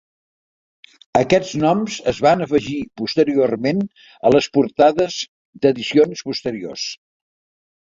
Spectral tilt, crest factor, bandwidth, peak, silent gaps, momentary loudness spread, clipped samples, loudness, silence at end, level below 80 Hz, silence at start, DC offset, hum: -5.5 dB/octave; 18 dB; 7.8 kHz; 0 dBFS; 5.28-5.53 s; 12 LU; under 0.1%; -18 LUFS; 0.95 s; -54 dBFS; 1.15 s; under 0.1%; none